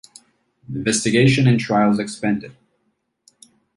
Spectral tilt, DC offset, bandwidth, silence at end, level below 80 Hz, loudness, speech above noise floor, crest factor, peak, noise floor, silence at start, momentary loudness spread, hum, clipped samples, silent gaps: -5.5 dB/octave; under 0.1%; 11.5 kHz; 1.25 s; -54 dBFS; -18 LUFS; 53 dB; 16 dB; -4 dBFS; -70 dBFS; 0.7 s; 11 LU; none; under 0.1%; none